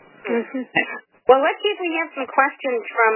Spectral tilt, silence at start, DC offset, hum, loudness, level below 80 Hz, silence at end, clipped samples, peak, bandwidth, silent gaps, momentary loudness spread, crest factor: -7.5 dB/octave; 0.25 s; under 0.1%; none; -21 LUFS; -68 dBFS; 0 s; under 0.1%; 0 dBFS; 3.1 kHz; none; 9 LU; 20 dB